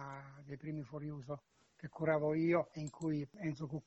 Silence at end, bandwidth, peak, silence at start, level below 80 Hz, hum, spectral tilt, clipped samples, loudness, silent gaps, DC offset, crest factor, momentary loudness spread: 0.05 s; 8.2 kHz; -22 dBFS; 0 s; -70 dBFS; none; -8 dB/octave; under 0.1%; -39 LUFS; none; under 0.1%; 18 dB; 17 LU